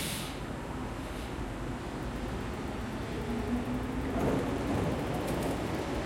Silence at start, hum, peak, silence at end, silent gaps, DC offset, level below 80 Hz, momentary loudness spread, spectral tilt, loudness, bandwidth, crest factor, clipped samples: 0 s; none; -18 dBFS; 0 s; none; under 0.1%; -44 dBFS; 7 LU; -5.5 dB/octave; -35 LUFS; 16.5 kHz; 16 dB; under 0.1%